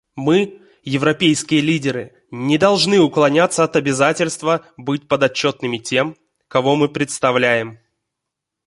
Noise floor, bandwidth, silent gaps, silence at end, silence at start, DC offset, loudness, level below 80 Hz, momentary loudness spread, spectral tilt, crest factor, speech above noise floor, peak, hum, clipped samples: -81 dBFS; 11.5 kHz; none; 0.95 s; 0.15 s; under 0.1%; -17 LUFS; -58 dBFS; 11 LU; -4.5 dB/octave; 16 dB; 64 dB; -2 dBFS; none; under 0.1%